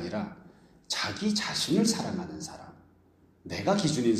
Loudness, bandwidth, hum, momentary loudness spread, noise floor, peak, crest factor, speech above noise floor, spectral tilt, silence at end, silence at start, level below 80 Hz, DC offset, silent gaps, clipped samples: -29 LUFS; 15 kHz; none; 15 LU; -62 dBFS; -12 dBFS; 18 dB; 33 dB; -4 dB/octave; 0 s; 0 s; -62 dBFS; under 0.1%; none; under 0.1%